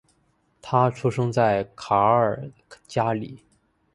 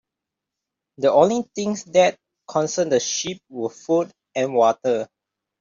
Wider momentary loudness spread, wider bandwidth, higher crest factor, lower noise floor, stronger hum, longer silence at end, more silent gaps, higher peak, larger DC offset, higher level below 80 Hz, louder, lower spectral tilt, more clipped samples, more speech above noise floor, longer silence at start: about the same, 12 LU vs 12 LU; first, 11.5 kHz vs 7.6 kHz; about the same, 20 dB vs 20 dB; second, -66 dBFS vs -85 dBFS; neither; about the same, 0.6 s vs 0.55 s; neither; about the same, -4 dBFS vs -2 dBFS; neither; first, -58 dBFS vs -68 dBFS; about the same, -23 LUFS vs -21 LUFS; first, -7 dB/octave vs -4 dB/octave; neither; second, 44 dB vs 65 dB; second, 0.65 s vs 1 s